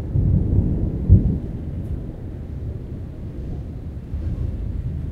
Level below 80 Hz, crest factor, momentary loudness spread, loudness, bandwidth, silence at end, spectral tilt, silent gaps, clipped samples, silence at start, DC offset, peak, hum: -26 dBFS; 22 dB; 16 LU; -24 LUFS; 3.2 kHz; 0 s; -11.5 dB/octave; none; under 0.1%; 0 s; under 0.1%; 0 dBFS; none